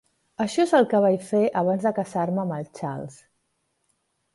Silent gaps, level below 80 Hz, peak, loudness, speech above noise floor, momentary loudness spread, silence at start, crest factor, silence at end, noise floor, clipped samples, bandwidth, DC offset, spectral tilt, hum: none; -68 dBFS; -6 dBFS; -23 LUFS; 51 dB; 13 LU; 0.4 s; 18 dB; 1.2 s; -73 dBFS; under 0.1%; 11.5 kHz; under 0.1%; -6.5 dB/octave; none